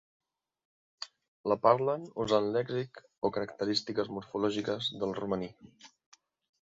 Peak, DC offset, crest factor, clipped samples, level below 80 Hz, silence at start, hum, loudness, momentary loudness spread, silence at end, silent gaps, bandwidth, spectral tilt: -10 dBFS; under 0.1%; 24 dB; under 0.1%; -68 dBFS; 1 s; none; -32 LUFS; 17 LU; 0.75 s; 1.28-1.44 s; 7.8 kHz; -5.5 dB/octave